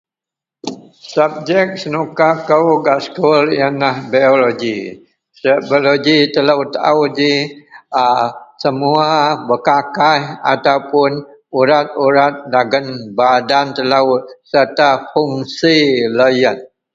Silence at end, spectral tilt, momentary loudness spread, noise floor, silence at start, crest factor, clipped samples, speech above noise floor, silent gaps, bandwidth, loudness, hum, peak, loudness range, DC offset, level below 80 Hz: 0.3 s; -5.5 dB/octave; 9 LU; -86 dBFS; 0.65 s; 14 dB; under 0.1%; 73 dB; none; 7.6 kHz; -14 LUFS; none; 0 dBFS; 1 LU; under 0.1%; -60 dBFS